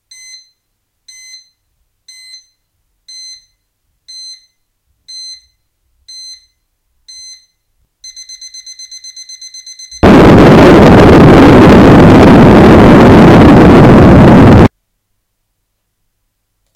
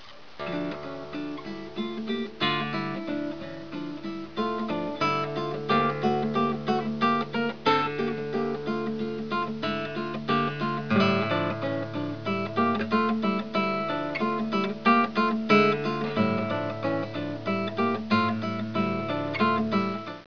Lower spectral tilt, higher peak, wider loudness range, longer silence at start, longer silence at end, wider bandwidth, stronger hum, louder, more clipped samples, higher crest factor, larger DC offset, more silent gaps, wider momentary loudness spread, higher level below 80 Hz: about the same, -7.5 dB/octave vs -7 dB/octave; first, 0 dBFS vs -8 dBFS; about the same, 6 LU vs 6 LU; first, 5.15 s vs 0 s; first, 2.1 s vs 0.05 s; first, 15.5 kHz vs 5.4 kHz; neither; first, -2 LUFS vs -27 LUFS; first, 9% vs under 0.1%; second, 6 dB vs 20 dB; second, under 0.1% vs 0.4%; neither; first, 25 LU vs 11 LU; first, -20 dBFS vs -62 dBFS